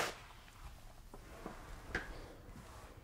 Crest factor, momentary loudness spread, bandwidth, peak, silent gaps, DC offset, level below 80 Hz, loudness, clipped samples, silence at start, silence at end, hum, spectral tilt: 26 dB; 13 LU; 16 kHz; -22 dBFS; none; under 0.1%; -56 dBFS; -50 LUFS; under 0.1%; 0 s; 0 s; none; -3.5 dB/octave